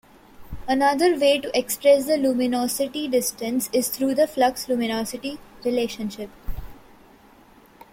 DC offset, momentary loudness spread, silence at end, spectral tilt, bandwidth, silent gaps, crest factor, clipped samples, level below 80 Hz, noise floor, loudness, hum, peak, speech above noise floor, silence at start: under 0.1%; 17 LU; 1.2 s; -3 dB/octave; 16.5 kHz; none; 18 dB; under 0.1%; -46 dBFS; -51 dBFS; -22 LUFS; none; -6 dBFS; 30 dB; 0.4 s